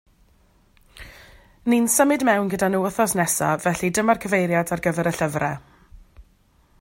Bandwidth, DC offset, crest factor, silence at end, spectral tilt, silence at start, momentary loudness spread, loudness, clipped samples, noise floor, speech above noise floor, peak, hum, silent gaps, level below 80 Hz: 16.5 kHz; under 0.1%; 18 dB; 0.6 s; -4.5 dB/octave; 0.95 s; 8 LU; -21 LUFS; under 0.1%; -59 dBFS; 38 dB; -4 dBFS; none; none; -52 dBFS